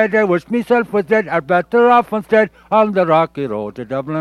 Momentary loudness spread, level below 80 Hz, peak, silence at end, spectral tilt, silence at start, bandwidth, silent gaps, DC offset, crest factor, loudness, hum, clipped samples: 11 LU; -54 dBFS; 0 dBFS; 0 s; -7.5 dB/octave; 0 s; 12.5 kHz; none; under 0.1%; 14 dB; -15 LUFS; none; under 0.1%